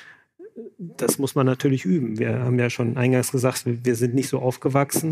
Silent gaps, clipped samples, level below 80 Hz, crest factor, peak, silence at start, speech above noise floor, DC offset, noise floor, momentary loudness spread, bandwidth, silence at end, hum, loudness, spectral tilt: none; under 0.1%; -68 dBFS; 18 dB; -4 dBFS; 0 s; 25 dB; under 0.1%; -46 dBFS; 5 LU; 15.5 kHz; 0 s; none; -22 LUFS; -6 dB/octave